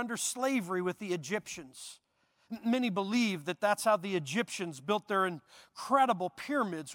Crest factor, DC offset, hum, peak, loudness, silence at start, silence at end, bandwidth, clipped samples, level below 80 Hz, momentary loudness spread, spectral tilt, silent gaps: 20 dB; under 0.1%; none; -14 dBFS; -32 LUFS; 0 s; 0 s; 17.5 kHz; under 0.1%; -78 dBFS; 16 LU; -4 dB/octave; none